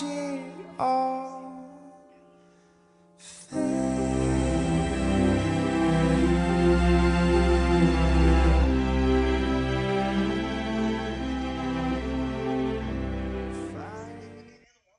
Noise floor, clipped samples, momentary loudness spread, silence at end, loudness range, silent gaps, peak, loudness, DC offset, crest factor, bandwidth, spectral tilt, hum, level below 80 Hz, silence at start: -59 dBFS; under 0.1%; 15 LU; 0.5 s; 10 LU; none; -8 dBFS; -25 LUFS; under 0.1%; 16 dB; 10.5 kHz; -6.5 dB/octave; none; -32 dBFS; 0 s